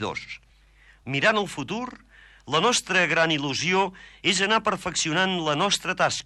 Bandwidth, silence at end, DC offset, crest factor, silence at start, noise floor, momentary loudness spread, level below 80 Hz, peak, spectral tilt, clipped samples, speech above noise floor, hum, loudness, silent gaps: 13 kHz; 0.05 s; under 0.1%; 18 dB; 0 s; -55 dBFS; 12 LU; -58 dBFS; -8 dBFS; -3 dB/octave; under 0.1%; 31 dB; none; -23 LUFS; none